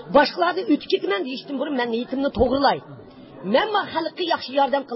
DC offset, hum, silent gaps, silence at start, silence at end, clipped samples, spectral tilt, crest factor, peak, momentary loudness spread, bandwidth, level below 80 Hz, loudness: under 0.1%; none; none; 0 s; 0 s; under 0.1%; -9 dB/octave; 18 dB; -4 dBFS; 8 LU; 5.8 kHz; -46 dBFS; -22 LUFS